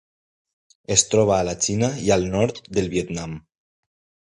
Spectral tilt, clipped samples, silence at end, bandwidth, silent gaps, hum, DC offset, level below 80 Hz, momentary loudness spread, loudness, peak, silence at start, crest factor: -4 dB/octave; under 0.1%; 0.95 s; 11 kHz; none; none; under 0.1%; -46 dBFS; 12 LU; -21 LUFS; 0 dBFS; 0.9 s; 24 dB